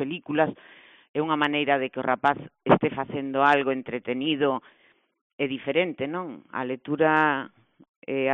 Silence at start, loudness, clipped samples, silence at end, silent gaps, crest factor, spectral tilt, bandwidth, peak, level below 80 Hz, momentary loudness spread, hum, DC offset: 0 s; -25 LUFS; under 0.1%; 0 s; 1.09-1.14 s, 5.21-5.38 s, 7.89-8.02 s; 20 dB; -3.5 dB/octave; 4.3 kHz; -6 dBFS; -66 dBFS; 11 LU; none; under 0.1%